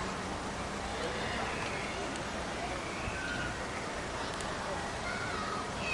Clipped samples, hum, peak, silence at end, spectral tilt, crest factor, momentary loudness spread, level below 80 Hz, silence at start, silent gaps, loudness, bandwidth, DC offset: under 0.1%; none; -22 dBFS; 0 s; -3.5 dB/octave; 14 dB; 3 LU; -50 dBFS; 0 s; none; -36 LUFS; 11.5 kHz; under 0.1%